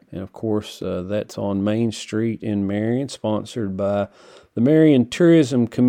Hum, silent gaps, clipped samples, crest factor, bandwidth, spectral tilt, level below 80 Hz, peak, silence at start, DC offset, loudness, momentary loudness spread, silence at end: none; none; under 0.1%; 16 dB; 12.5 kHz; -7 dB/octave; -60 dBFS; -4 dBFS; 0.1 s; under 0.1%; -20 LUFS; 13 LU; 0 s